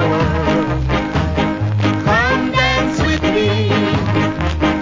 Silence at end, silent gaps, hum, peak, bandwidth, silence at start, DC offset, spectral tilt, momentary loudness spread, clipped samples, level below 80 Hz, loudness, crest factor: 0 s; none; none; 0 dBFS; 7.6 kHz; 0 s; under 0.1%; -6.5 dB/octave; 4 LU; under 0.1%; -26 dBFS; -16 LUFS; 14 dB